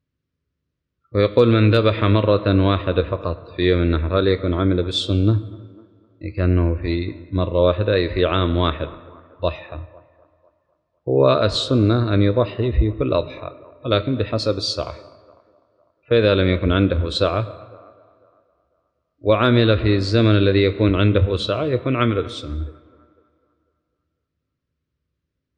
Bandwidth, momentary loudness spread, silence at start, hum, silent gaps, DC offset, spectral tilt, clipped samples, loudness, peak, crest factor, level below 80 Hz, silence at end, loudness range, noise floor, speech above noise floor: 9.4 kHz; 14 LU; 1.15 s; none; none; under 0.1%; -7.5 dB/octave; under 0.1%; -19 LUFS; -4 dBFS; 16 dB; -36 dBFS; 2.85 s; 6 LU; -78 dBFS; 60 dB